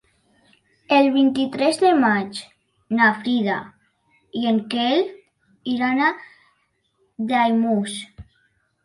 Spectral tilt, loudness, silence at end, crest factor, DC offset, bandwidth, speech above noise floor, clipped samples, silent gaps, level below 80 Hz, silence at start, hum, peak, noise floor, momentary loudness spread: -5 dB/octave; -20 LUFS; 0.65 s; 18 dB; under 0.1%; 11.5 kHz; 48 dB; under 0.1%; none; -62 dBFS; 0.9 s; none; -4 dBFS; -67 dBFS; 15 LU